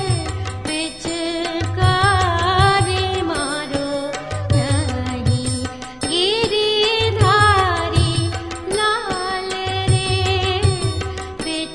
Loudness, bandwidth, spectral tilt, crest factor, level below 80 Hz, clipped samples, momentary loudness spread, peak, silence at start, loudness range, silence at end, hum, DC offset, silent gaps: -19 LUFS; 11 kHz; -4.5 dB/octave; 18 dB; -36 dBFS; under 0.1%; 10 LU; -2 dBFS; 0 s; 3 LU; 0 s; none; 0.3%; none